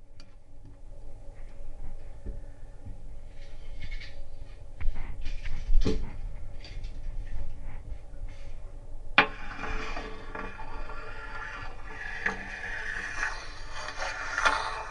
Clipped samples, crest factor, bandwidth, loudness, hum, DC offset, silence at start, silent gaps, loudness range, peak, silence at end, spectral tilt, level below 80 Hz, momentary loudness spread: under 0.1%; 28 dB; 9.8 kHz; -34 LUFS; none; under 0.1%; 0 s; none; 14 LU; -2 dBFS; 0 s; -4 dB/octave; -34 dBFS; 21 LU